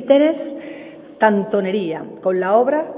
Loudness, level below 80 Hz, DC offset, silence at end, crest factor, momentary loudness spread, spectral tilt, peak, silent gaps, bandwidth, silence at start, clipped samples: -18 LUFS; -68 dBFS; under 0.1%; 0 s; 18 dB; 18 LU; -10 dB/octave; 0 dBFS; none; 3.9 kHz; 0 s; under 0.1%